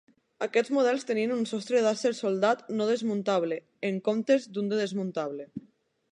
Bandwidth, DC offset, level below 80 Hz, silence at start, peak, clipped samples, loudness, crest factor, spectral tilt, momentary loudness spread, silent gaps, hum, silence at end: 10.5 kHz; under 0.1%; -82 dBFS; 0.4 s; -10 dBFS; under 0.1%; -28 LUFS; 18 dB; -5 dB/octave; 8 LU; none; none; 0.5 s